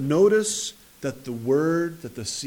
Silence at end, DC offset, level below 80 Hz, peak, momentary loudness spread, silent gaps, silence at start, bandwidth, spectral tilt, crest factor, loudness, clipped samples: 0 s; under 0.1%; -62 dBFS; -8 dBFS; 14 LU; none; 0 s; 19 kHz; -4.5 dB/octave; 16 dB; -24 LUFS; under 0.1%